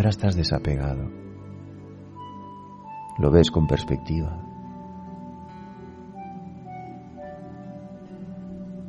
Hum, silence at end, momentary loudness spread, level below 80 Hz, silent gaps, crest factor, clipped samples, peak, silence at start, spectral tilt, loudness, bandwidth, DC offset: none; 0 s; 20 LU; -38 dBFS; none; 24 dB; under 0.1%; -4 dBFS; 0 s; -7 dB/octave; -24 LUFS; 9.6 kHz; under 0.1%